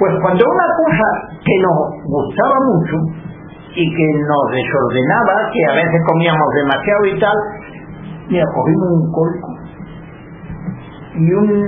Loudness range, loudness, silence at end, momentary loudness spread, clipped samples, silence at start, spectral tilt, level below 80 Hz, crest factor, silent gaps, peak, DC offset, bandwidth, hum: 5 LU; -14 LUFS; 0 s; 19 LU; under 0.1%; 0 s; -11 dB/octave; -44 dBFS; 14 dB; none; 0 dBFS; under 0.1%; 3.8 kHz; none